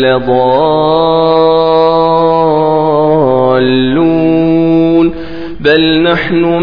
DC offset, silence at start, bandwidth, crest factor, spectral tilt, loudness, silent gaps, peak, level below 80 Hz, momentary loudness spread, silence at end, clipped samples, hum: 3%; 0 s; 5.2 kHz; 8 dB; -9 dB/octave; -9 LUFS; none; 0 dBFS; -36 dBFS; 2 LU; 0 s; 0.3%; none